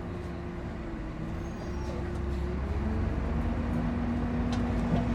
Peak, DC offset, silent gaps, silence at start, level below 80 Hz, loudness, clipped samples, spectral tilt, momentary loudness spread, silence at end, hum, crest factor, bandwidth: -16 dBFS; under 0.1%; none; 0 s; -36 dBFS; -33 LUFS; under 0.1%; -8 dB/octave; 8 LU; 0 s; none; 16 dB; 9.8 kHz